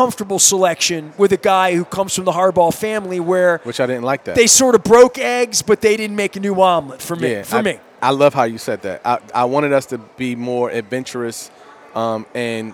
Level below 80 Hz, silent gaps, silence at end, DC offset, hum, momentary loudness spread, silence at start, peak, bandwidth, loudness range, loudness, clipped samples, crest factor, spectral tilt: -54 dBFS; none; 0 s; under 0.1%; none; 13 LU; 0 s; 0 dBFS; over 20 kHz; 7 LU; -16 LUFS; under 0.1%; 16 dB; -3 dB/octave